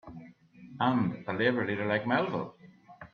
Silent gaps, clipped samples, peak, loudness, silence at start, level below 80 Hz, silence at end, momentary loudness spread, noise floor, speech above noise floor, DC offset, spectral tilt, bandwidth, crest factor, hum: none; under 0.1%; -14 dBFS; -30 LUFS; 0.05 s; -68 dBFS; 0.05 s; 20 LU; -53 dBFS; 23 dB; under 0.1%; -8.5 dB/octave; 6.4 kHz; 18 dB; none